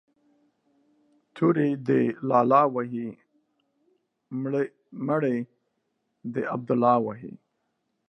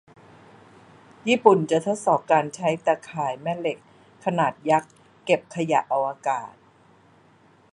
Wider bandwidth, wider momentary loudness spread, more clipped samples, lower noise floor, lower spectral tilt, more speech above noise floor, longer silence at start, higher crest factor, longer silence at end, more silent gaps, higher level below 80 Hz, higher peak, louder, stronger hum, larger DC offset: second, 6.2 kHz vs 11 kHz; first, 17 LU vs 12 LU; neither; first, -77 dBFS vs -56 dBFS; first, -9.5 dB/octave vs -5.5 dB/octave; first, 52 dB vs 34 dB; about the same, 1.35 s vs 1.25 s; about the same, 22 dB vs 24 dB; second, 0.75 s vs 1.25 s; neither; about the same, -76 dBFS vs -72 dBFS; second, -6 dBFS vs -2 dBFS; about the same, -25 LUFS vs -23 LUFS; neither; neither